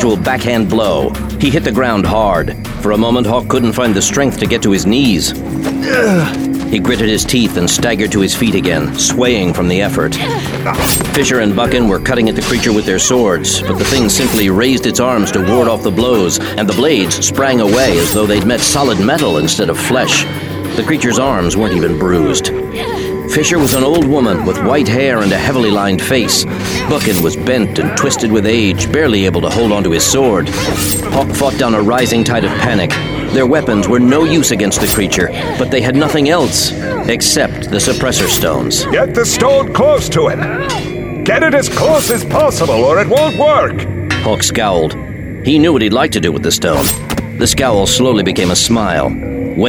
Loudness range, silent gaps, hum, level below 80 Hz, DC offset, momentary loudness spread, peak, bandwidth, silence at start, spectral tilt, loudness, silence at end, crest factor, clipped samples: 1 LU; none; none; -32 dBFS; under 0.1%; 5 LU; 0 dBFS; over 20 kHz; 0 s; -4 dB/octave; -12 LUFS; 0 s; 12 dB; under 0.1%